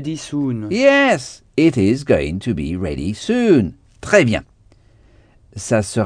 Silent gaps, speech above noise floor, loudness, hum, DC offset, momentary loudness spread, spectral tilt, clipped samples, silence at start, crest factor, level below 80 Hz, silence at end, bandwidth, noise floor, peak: none; 34 dB; -17 LUFS; none; under 0.1%; 11 LU; -5.5 dB/octave; under 0.1%; 0 s; 18 dB; -40 dBFS; 0 s; 10 kHz; -50 dBFS; 0 dBFS